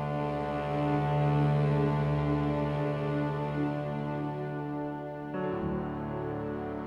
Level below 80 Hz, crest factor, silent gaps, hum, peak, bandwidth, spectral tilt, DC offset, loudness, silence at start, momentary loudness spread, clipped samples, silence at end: -50 dBFS; 14 dB; none; none; -16 dBFS; 5.6 kHz; -9.5 dB/octave; under 0.1%; -31 LUFS; 0 s; 9 LU; under 0.1%; 0 s